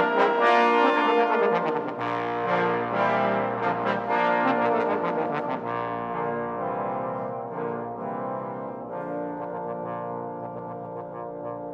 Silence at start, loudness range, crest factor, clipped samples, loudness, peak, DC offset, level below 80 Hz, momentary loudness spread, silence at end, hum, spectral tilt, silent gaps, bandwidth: 0 s; 10 LU; 18 dB; under 0.1%; -26 LUFS; -8 dBFS; under 0.1%; -66 dBFS; 14 LU; 0 s; none; -7 dB/octave; none; 7.8 kHz